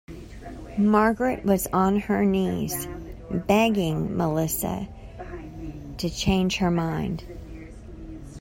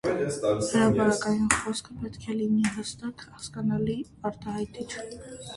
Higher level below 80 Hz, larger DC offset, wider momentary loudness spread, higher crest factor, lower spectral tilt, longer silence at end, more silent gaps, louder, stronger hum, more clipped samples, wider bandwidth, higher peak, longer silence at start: first, -42 dBFS vs -54 dBFS; neither; first, 20 LU vs 15 LU; second, 20 dB vs 26 dB; about the same, -5.5 dB/octave vs -5 dB/octave; about the same, 0 s vs 0 s; neither; first, -24 LUFS vs -28 LUFS; neither; neither; first, 16 kHz vs 11.5 kHz; second, -6 dBFS vs -2 dBFS; about the same, 0.1 s vs 0.05 s